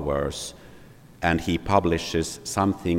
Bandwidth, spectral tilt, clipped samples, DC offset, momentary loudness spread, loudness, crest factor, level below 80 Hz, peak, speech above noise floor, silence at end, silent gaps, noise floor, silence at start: 16.5 kHz; -5 dB/octave; under 0.1%; under 0.1%; 8 LU; -25 LUFS; 22 dB; -44 dBFS; -4 dBFS; 23 dB; 0 s; none; -48 dBFS; 0 s